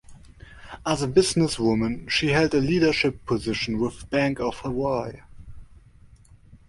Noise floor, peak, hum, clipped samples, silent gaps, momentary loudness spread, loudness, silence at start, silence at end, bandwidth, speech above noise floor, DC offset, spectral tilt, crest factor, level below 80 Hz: -51 dBFS; -6 dBFS; none; under 0.1%; none; 8 LU; -24 LUFS; 0.1 s; 0.15 s; 11.5 kHz; 28 dB; under 0.1%; -5 dB/octave; 20 dB; -46 dBFS